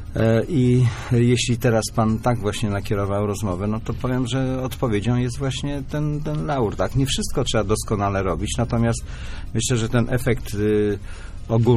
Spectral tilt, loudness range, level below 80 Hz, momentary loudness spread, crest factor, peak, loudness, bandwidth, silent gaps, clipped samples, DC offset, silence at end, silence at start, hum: -6 dB/octave; 3 LU; -34 dBFS; 7 LU; 14 dB; -6 dBFS; -22 LUFS; 15 kHz; none; under 0.1%; under 0.1%; 0 s; 0 s; none